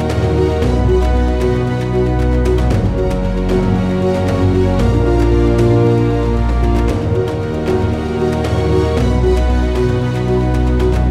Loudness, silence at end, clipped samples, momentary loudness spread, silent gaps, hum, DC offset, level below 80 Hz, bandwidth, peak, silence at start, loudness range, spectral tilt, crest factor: -15 LUFS; 0 s; under 0.1%; 4 LU; none; none; under 0.1%; -18 dBFS; 11 kHz; -2 dBFS; 0 s; 2 LU; -8 dB/octave; 12 dB